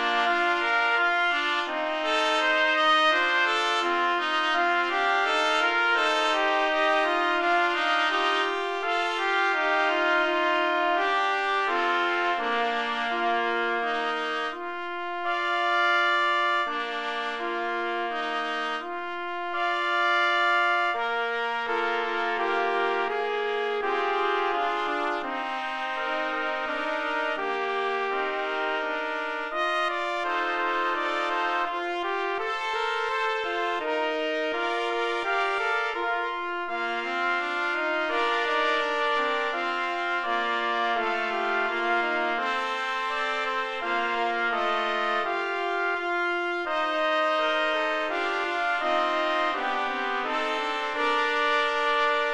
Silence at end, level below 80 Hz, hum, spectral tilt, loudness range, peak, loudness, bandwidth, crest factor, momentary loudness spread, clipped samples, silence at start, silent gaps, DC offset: 0 s; -64 dBFS; none; -1.5 dB/octave; 5 LU; -10 dBFS; -25 LUFS; 11.5 kHz; 16 dB; 6 LU; under 0.1%; 0 s; none; under 0.1%